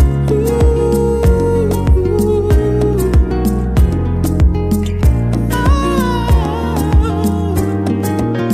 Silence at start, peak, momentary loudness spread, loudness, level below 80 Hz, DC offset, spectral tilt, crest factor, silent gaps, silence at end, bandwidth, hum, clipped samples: 0 s; -2 dBFS; 3 LU; -14 LUFS; -16 dBFS; under 0.1%; -7.5 dB/octave; 10 dB; none; 0 s; 15.5 kHz; none; under 0.1%